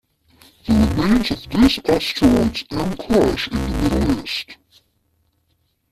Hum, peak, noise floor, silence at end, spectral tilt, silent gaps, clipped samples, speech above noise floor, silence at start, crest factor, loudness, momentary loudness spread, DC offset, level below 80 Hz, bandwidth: none; -2 dBFS; -66 dBFS; 1.4 s; -6 dB/octave; none; under 0.1%; 48 dB; 0.65 s; 16 dB; -18 LUFS; 9 LU; under 0.1%; -32 dBFS; 14.5 kHz